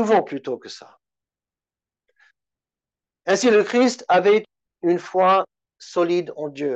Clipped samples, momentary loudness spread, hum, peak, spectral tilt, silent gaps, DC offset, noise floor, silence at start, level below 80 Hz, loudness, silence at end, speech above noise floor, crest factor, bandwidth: under 0.1%; 15 LU; none; -6 dBFS; -4.5 dB/octave; none; under 0.1%; under -90 dBFS; 0 s; -74 dBFS; -20 LUFS; 0 s; over 71 dB; 14 dB; 8.6 kHz